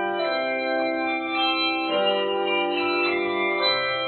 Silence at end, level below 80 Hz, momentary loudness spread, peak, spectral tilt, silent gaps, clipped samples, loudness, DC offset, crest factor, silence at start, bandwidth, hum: 0 s; -68 dBFS; 3 LU; -10 dBFS; -7 dB/octave; none; under 0.1%; -23 LUFS; under 0.1%; 14 dB; 0 s; 4.7 kHz; none